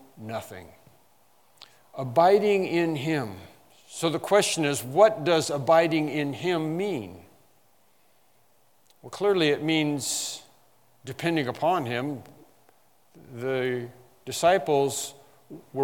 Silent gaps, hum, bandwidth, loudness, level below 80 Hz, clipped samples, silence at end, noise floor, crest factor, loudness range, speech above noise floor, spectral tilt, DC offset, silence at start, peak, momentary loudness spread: none; none; 18 kHz; -25 LUFS; -74 dBFS; under 0.1%; 0 s; -65 dBFS; 22 dB; 7 LU; 40 dB; -4.5 dB/octave; under 0.1%; 0.15 s; -4 dBFS; 20 LU